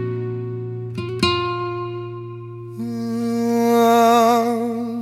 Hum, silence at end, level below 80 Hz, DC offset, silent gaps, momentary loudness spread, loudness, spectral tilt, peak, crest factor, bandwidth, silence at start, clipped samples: none; 0 s; -56 dBFS; under 0.1%; none; 17 LU; -19 LUFS; -5.5 dB/octave; -2 dBFS; 18 dB; 16.5 kHz; 0 s; under 0.1%